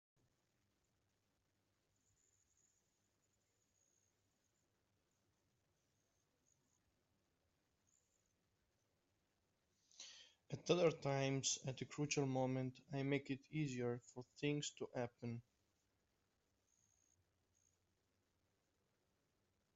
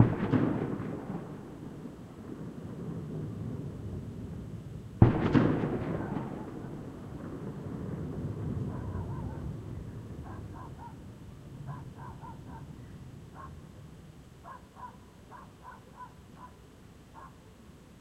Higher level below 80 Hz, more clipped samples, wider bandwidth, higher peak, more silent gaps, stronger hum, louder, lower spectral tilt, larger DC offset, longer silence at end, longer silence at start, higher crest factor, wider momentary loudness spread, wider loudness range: second, -84 dBFS vs -50 dBFS; neither; second, 8 kHz vs 12 kHz; second, -22 dBFS vs -6 dBFS; neither; neither; second, -43 LUFS vs -35 LUFS; second, -5 dB/octave vs -9 dB/octave; neither; first, 4.35 s vs 0 s; first, 10 s vs 0 s; about the same, 26 dB vs 30 dB; second, 17 LU vs 22 LU; second, 13 LU vs 19 LU